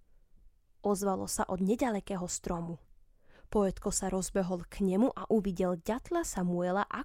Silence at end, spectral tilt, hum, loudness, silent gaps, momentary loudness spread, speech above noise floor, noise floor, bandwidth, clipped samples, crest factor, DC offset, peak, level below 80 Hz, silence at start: 0 s; -5.5 dB/octave; none; -33 LUFS; none; 6 LU; 28 dB; -60 dBFS; 16.5 kHz; under 0.1%; 16 dB; under 0.1%; -16 dBFS; -52 dBFS; 0.45 s